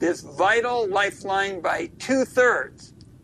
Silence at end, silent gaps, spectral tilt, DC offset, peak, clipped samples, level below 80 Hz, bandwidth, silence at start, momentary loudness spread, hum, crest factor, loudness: 0.4 s; none; -3.5 dB/octave; under 0.1%; -8 dBFS; under 0.1%; -58 dBFS; 13.5 kHz; 0 s; 7 LU; none; 16 dB; -22 LUFS